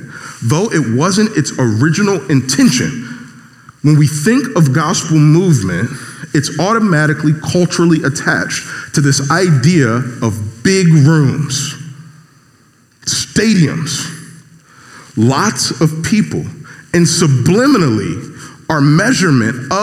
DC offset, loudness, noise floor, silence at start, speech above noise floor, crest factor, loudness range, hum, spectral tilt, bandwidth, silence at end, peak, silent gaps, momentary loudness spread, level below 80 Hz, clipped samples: under 0.1%; -12 LUFS; -49 dBFS; 0 s; 38 dB; 12 dB; 4 LU; none; -5 dB/octave; 14.5 kHz; 0 s; 0 dBFS; none; 12 LU; -50 dBFS; under 0.1%